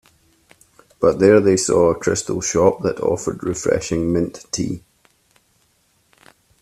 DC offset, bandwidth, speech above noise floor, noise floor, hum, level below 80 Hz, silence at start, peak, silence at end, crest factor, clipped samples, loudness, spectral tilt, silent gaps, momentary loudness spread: under 0.1%; 13.5 kHz; 44 dB; -62 dBFS; none; -48 dBFS; 1 s; 0 dBFS; 1.85 s; 20 dB; under 0.1%; -18 LUFS; -5 dB/octave; none; 11 LU